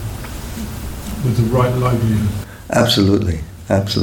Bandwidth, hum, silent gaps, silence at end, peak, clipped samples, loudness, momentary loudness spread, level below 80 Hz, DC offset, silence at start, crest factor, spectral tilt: 19 kHz; none; none; 0 s; -2 dBFS; under 0.1%; -18 LUFS; 14 LU; -32 dBFS; under 0.1%; 0 s; 16 dB; -6 dB/octave